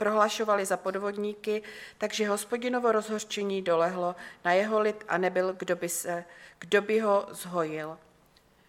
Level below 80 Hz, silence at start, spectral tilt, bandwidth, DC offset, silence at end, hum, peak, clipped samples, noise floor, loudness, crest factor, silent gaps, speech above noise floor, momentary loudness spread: -74 dBFS; 0 s; -4 dB/octave; 17 kHz; under 0.1%; 0.7 s; none; -10 dBFS; under 0.1%; -62 dBFS; -29 LUFS; 20 dB; none; 33 dB; 10 LU